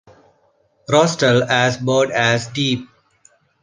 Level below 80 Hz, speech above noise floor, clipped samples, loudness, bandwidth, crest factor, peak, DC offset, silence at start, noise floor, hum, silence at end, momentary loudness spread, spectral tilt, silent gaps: -56 dBFS; 44 dB; under 0.1%; -17 LUFS; 10 kHz; 18 dB; -2 dBFS; under 0.1%; 0.9 s; -60 dBFS; none; 0.8 s; 6 LU; -4.5 dB/octave; none